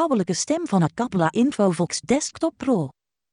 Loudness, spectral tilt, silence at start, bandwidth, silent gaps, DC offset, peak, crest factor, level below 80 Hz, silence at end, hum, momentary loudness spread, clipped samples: -22 LUFS; -5.5 dB/octave; 0 s; 11 kHz; none; under 0.1%; -8 dBFS; 14 dB; -60 dBFS; 0.4 s; none; 5 LU; under 0.1%